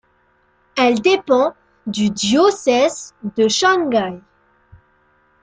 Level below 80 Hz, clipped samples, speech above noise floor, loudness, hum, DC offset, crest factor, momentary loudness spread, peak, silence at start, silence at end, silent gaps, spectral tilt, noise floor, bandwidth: -58 dBFS; under 0.1%; 43 dB; -17 LUFS; none; under 0.1%; 16 dB; 13 LU; -2 dBFS; 0.75 s; 1.25 s; none; -3.5 dB/octave; -59 dBFS; 9.6 kHz